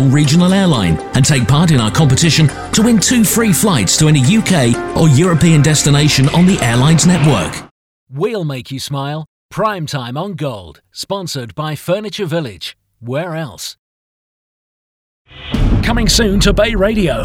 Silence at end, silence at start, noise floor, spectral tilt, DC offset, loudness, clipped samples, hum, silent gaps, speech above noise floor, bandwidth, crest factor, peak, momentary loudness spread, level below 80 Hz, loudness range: 0 s; 0 s; under -90 dBFS; -5 dB/octave; under 0.1%; -13 LUFS; under 0.1%; none; 7.71-8.07 s, 9.28-9.49 s, 13.79-15.25 s; over 78 dB; 17 kHz; 12 dB; 0 dBFS; 13 LU; -28 dBFS; 12 LU